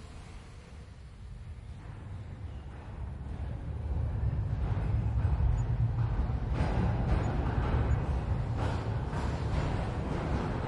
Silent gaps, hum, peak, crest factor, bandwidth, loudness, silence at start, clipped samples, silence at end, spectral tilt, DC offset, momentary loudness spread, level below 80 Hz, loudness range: none; none; -18 dBFS; 14 dB; 10.5 kHz; -33 LUFS; 0 s; under 0.1%; 0 s; -8 dB/octave; under 0.1%; 17 LU; -36 dBFS; 12 LU